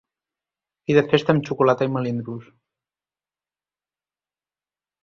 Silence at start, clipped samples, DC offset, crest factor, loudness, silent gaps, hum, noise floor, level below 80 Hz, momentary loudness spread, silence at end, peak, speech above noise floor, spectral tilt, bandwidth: 0.9 s; under 0.1%; under 0.1%; 22 dB; -20 LUFS; none; 50 Hz at -50 dBFS; under -90 dBFS; -64 dBFS; 16 LU; 2.6 s; -2 dBFS; over 70 dB; -7.5 dB/octave; 7.2 kHz